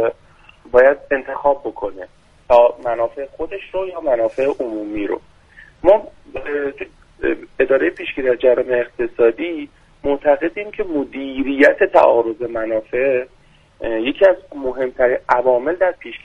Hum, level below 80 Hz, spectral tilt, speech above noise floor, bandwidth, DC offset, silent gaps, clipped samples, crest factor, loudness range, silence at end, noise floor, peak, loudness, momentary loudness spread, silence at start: none; -46 dBFS; -6.5 dB/octave; 31 dB; 6.8 kHz; under 0.1%; none; under 0.1%; 18 dB; 4 LU; 0.05 s; -48 dBFS; 0 dBFS; -18 LUFS; 14 LU; 0 s